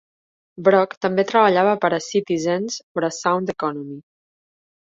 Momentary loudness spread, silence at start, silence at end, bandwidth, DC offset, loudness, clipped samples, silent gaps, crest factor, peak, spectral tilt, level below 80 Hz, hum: 11 LU; 0.55 s; 0.85 s; 7.8 kHz; under 0.1%; -20 LUFS; under 0.1%; 0.97-1.01 s, 2.83-2.95 s; 18 dB; -2 dBFS; -5 dB/octave; -66 dBFS; none